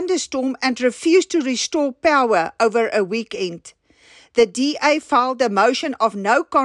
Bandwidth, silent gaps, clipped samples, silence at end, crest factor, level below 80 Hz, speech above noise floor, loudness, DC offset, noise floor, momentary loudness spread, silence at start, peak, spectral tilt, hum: 11 kHz; none; under 0.1%; 0 s; 14 dB; -62 dBFS; 32 dB; -19 LUFS; under 0.1%; -50 dBFS; 7 LU; 0 s; -4 dBFS; -3.5 dB/octave; none